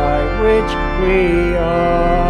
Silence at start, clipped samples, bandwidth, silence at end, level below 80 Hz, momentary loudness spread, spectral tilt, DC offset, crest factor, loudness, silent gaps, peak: 0 s; under 0.1%; 9.6 kHz; 0 s; -22 dBFS; 3 LU; -7.5 dB/octave; under 0.1%; 12 dB; -15 LUFS; none; -2 dBFS